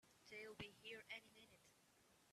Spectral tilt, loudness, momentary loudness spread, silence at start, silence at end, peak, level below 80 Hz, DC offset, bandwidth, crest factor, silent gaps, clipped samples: -3 dB/octave; -57 LUFS; 13 LU; 0.05 s; 0 s; -40 dBFS; -84 dBFS; under 0.1%; 14 kHz; 22 dB; none; under 0.1%